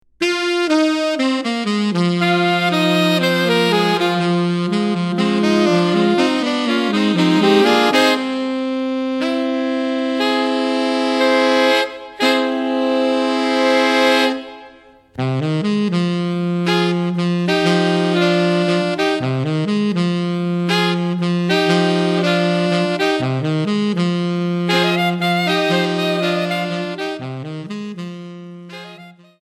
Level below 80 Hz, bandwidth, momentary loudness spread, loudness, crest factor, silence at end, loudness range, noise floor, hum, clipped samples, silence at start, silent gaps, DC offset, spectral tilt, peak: -60 dBFS; 13.5 kHz; 7 LU; -17 LUFS; 16 dB; 0.3 s; 3 LU; -45 dBFS; none; under 0.1%; 0.2 s; none; under 0.1%; -5.5 dB/octave; 0 dBFS